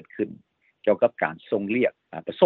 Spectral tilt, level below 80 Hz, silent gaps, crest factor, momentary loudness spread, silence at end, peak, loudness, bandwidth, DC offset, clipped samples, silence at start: -9.5 dB/octave; -72 dBFS; none; 20 dB; 11 LU; 0 s; -4 dBFS; -26 LUFS; 4.3 kHz; under 0.1%; under 0.1%; 0.15 s